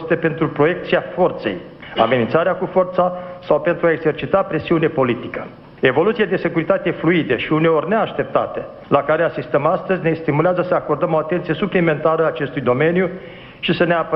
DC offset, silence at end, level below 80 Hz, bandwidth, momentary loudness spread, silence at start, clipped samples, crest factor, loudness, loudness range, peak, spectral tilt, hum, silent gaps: under 0.1%; 0 s; -50 dBFS; 5.6 kHz; 8 LU; 0 s; under 0.1%; 18 dB; -18 LUFS; 1 LU; 0 dBFS; -9.5 dB/octave; none; none